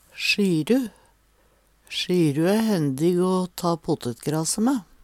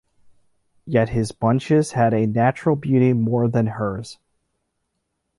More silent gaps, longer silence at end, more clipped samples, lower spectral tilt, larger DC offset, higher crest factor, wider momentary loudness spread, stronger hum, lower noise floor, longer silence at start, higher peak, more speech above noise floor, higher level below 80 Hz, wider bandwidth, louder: neither; second, 0.2 s vs 1.25 s; neither; second, -5 dB/octave vs -7.5 dB/octave; neither; about the same, 16 dB vs 16 dB; about the same, 7 LU vs 8 LU; neither; second, -61 dBFS vs -75 dBFS; second, 0.15 s vs 0.85 s; about the same, -8 dBFS vs -6 dBFS; second, 39 dB vs 56 dB; second, -60 dBFS vs -50 dBFS; first, 17 kHz vs 11.5 kHz; second, -23 LUFS vs -20 LUFS